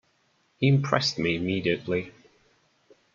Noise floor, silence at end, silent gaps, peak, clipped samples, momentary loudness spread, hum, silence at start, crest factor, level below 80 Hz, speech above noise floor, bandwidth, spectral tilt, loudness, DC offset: -68 dBFS; 1.05 s; none; -6 dBFS; under 0.1%; 8 LU; none; 0.6 s; 22 dB; -62 dBFS; 43 dB; 7.4 kHz; -6 dB/octave; -26 LUFS; under 0.1%